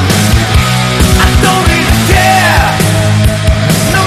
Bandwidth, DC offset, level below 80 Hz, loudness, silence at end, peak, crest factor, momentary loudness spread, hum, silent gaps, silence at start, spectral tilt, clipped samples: 14.5 kHz; under 0.1%; -16 dBFS; -8 LUFS; 0 s; 0 dBFS; 8 dB; 3 LU; none; none; 0 s; -4.5 dB/octave; 0.4%